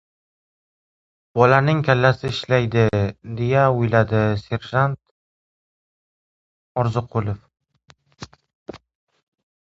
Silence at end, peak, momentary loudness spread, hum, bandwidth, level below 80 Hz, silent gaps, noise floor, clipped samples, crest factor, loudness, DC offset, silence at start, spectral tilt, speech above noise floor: 1 s; 0 dBFS; 14 LU; none; 7.8 kHz; -48 dBFS; 5.11-6.75 s, 8.55-8.66 s; -43 dBFS; under 0.1%; 22 dB; -20 LUFS; under 0.1%; 1.35 s; -7.5 dB/octave; 24 dB